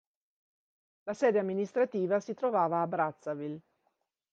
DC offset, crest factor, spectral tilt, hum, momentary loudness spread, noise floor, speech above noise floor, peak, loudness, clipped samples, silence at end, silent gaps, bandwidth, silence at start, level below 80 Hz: under 0.1%; 18 dB; -7 dB/octave; none; 13 LU; -79 dBFS; 49 dB; -16 dBFS; -31 LUFS; under 0.1%; 0.7 s; none; 8 kHz; 1.05 s; -84 dBFS